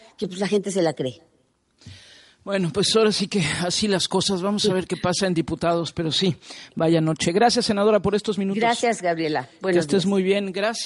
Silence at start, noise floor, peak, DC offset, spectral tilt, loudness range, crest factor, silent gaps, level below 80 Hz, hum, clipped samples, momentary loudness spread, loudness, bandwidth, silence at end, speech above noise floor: 0.2 s; -63 dBFS; -6 dBFS; under 0.1%; -4.5 dB/octave; 3 LU; 16 dB; none; -56 dBFS; none; under 0.1%; 7 LU; -22 LUFS; 11.5 kHz; 0 s; 41 dB